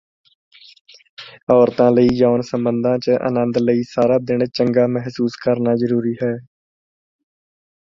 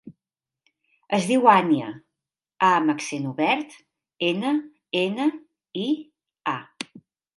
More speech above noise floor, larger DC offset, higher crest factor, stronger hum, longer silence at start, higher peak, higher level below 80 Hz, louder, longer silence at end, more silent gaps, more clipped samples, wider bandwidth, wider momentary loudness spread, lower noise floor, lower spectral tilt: first, over 74 dB vs 68 dB; neither; about the same, 18 dB vs 22 dB; neither; first, 1.2 s vs 0.05 s; about the same, -2 dBFS vs -2 dBFS; first, -54 dBFS vs -76 dBFS; first, -17 LUFS vs -23 LUFS; first, 1.55 s vs 0.5 s; first, 1.43-1.47 s vs none; neither; second, 7.2 kHz vs 11.5 kHz; second, 9 LU vs 19 LU; about the same, under -90 dBFS vs -90 dBFS; first, -8 dB/octave vs -5 dB/octave